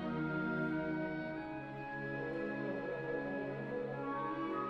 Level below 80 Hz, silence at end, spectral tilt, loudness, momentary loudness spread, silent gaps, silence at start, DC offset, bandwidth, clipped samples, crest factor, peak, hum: -66 dBFS; 0 s; -8.5 dB/octave; -40 LUFS; 6 LU; none; 0 s; under 0.1%; 6.2 kHz; under 0.1%; 14 dB; -26 dBFS; none